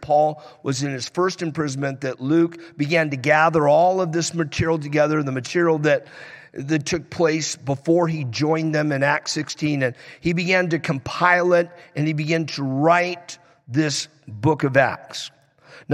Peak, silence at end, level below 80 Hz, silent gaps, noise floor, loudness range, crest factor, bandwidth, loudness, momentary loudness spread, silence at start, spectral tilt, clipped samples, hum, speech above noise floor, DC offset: -4 dBFS; 0 s; -56 dBFS; none; -48 dBFS; 3 LU; 18 dB; 12.5 kHz; -21 LUFS; 11 LU; 0 s; -5 dB/octave; under 0.1%; none; 28 dB; under 0.1%